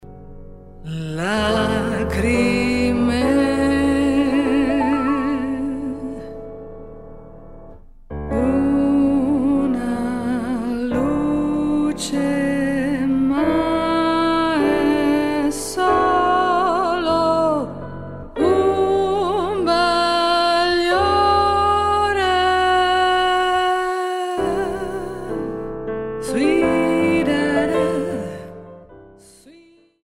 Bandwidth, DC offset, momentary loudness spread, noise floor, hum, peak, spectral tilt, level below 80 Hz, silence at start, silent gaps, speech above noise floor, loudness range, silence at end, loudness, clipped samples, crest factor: 13.5 kHz; under 0.1%; 11 LU; -51 dBFS; none; -6 dBFS; -5.5 dB/octave; -38 dBFS; 0.05 s; none; 31 dB; 5 LU; 0.5 s; -19 LUFS; under 0.1%; 12 dB